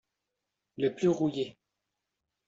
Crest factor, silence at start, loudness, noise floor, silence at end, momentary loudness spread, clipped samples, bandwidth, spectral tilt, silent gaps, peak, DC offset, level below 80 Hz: 18 dB; 0.8 s; -31 LUFS; -86 dBFS; 0.95 s; 11 LU; under 0.1%; 7.8 kHz; -7 dB/octave; none; -16 dBFS; under 0.1%; -72 dBFS